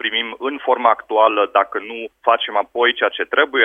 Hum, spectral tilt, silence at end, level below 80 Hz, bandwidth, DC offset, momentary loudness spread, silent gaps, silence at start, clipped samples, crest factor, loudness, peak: none; -4 dB/octave; 0 s; -66 dBFS; 3.8 kHz; under 0.1%; 8 LU; none; 0 s; under 0.1%; 18 dB; -18 LUFS; 0 dBFS